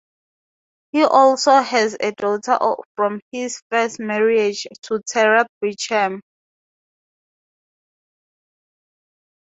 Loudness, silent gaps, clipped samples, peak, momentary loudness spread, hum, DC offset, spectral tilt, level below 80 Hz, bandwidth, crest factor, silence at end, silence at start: -18 LUFS; 2.85-2.95 s, 3.22-3.31 s, 3.62-3.70 s, 5.49-5.61 s; under 0.1%; -2 dBFS; 13 LU; none; under 0.1%; -3 dB/octave; -72 dBFS; 8 kHz; 20 dB; 3.35 s; 0.95 s